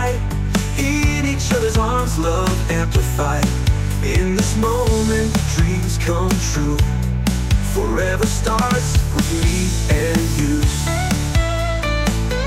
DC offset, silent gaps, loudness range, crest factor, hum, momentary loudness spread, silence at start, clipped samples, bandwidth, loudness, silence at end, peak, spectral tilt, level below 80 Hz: under 0.1%; none; 1 LU; 14 dB; none; 2 LU; 0 s; under 0.1%; 16 kHz; -18 LUFS; 0 s; -4 dBFS; -5 dB/octave; -22 dBFS